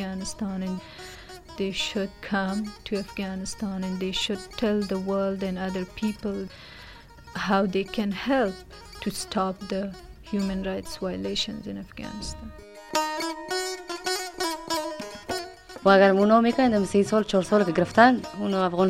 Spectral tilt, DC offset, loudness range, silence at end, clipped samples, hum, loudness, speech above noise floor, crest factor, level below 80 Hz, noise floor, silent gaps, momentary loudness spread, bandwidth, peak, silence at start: -5 dB/octave; under 0.1%; 9 LU; 0 s; under 0.1%; none; -26 LUFS; 21 dB; 24 dB; -50 dBFS; -46 dBFS; none; 18 LU; 16 kHz; -2 dBFS; 0 s